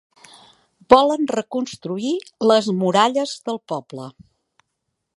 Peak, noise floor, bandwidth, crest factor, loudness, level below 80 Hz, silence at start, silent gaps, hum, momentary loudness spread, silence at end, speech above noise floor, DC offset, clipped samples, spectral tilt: 0 dBFS; -77 dBFS; 11.5 kHz; 20 dB; -19 LUFS; -56 dBFS; 0.9 s; none; none; 15 LU; 1.05 s; 58 dB; under 0.1%; under 0.1%; -5 dB/octave